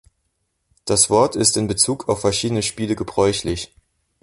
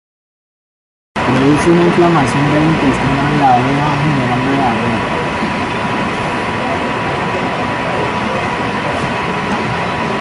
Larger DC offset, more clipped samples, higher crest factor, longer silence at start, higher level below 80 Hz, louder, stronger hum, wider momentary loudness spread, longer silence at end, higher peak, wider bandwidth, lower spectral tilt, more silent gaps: neither; neither; first, 20 dB vs 12 dB; second, 0.85 s vs 1.15 s; second, -44 dBFS vs -36 dBFS; second, -18 LUFS vs -14 LUFS; neither; first, 11 LU vs 6 LU; first, 0.6 s vs 0 s; about the same, 0 dBFS vs -2 dBFS; about the same, 12 kHz vs 11.5 kHz; second, -3.5 dB/octave vs -6 dB/octave; neither